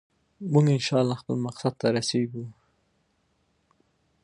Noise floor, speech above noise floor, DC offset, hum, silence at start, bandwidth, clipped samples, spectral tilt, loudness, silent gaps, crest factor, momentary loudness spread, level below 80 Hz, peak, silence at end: -70 dBFS; 46 dB; under 0.1%; none; 0.4 s; 11 kHz; under 0.1%; -6 dB/octave; -25 LUFS; none; 20 dB; 15 LU; -68 dBFS; -8 dBFS; 1.7 s